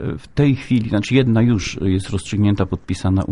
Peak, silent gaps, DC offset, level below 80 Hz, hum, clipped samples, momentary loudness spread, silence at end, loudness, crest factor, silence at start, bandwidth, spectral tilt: -2 dBFS; none; under 0.1%; -40 dBFS; none; under 0.1%; 7 LU; 0 s; -18 LUFS; 16 dB; 0 s; 11 kHz; -7 dB/octave